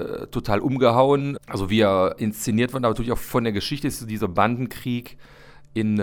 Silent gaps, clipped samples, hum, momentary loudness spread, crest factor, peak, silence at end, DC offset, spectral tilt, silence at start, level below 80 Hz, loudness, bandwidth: none; under 0.1%; none; 11 LU; 20 dB; -4 dBFS; 0 s; under 0.1%; -6 dB/octave; 0 s; -42 dBFS; -23 LUFS; over 20 kHz